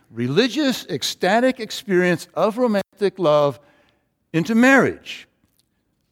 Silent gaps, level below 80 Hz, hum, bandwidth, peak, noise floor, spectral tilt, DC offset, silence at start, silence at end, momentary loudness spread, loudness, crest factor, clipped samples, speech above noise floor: none; -64 dBFS; none; 16.5 kHz; -2 dBFS; -69 dBFS; -5 dB/octave; under 0.1%; 0.15 s; 0.9 s; 10 LU; -19 LUFS; 18 dB; under 0.1%; 50 dB